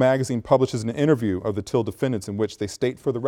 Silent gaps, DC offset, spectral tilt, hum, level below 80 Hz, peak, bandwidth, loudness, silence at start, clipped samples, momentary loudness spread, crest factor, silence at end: none; under 0.1%; -6.5 dB/octave; none; -54 dBFS; -4 dBFS; 16.5 kHz; -24 LUFS; 0 s; under 0.1%; 6 LU; 18 dB; 0 s